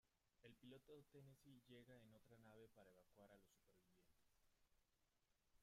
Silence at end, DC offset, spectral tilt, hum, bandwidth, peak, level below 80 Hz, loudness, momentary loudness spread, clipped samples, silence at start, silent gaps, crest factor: 0 s; under 0.1%; -5.5 dB/octave; none; 15 kHz; -52 dBFS; -88 dBFS; -68 LUFS; 3 LU; under 0.1%; 0.05 s; none; 20 dB